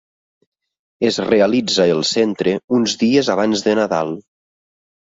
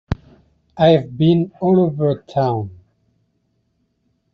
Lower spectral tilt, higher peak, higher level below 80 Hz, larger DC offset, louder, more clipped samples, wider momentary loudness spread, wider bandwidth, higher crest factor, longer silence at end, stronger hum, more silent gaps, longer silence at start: second, -4.5 dB/octave vs -7 dB/octave; about the same, 0 dBFS vs -2 dBFS; second, -58 dBFS vs -44 dBFS; neither; about the same, -17 LUFS vs -17 LUFS; neither; second, 6 LU vs 13 LU; first, 7.8 kHz vs 6.4 kHz; about the same, 18 dB vs 16 dB; second, 0.85 s vs 1.6 s; neither; first, 2.64-2.68 s vs none; first, 1 s vs 0.1 s